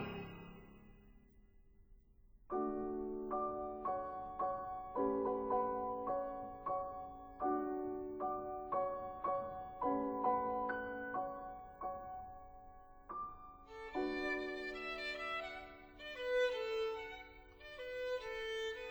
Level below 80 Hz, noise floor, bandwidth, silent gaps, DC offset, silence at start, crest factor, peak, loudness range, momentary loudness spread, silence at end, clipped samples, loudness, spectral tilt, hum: -64 dBFS; -65 dBFS; over 20 kHz; none; under 0.1%; 0 s; 20 dB; -24 dBFS; 5 LU; 15 LU; 0 s; under 0.1%; -41 LUFS; -5.5 dB/octave; none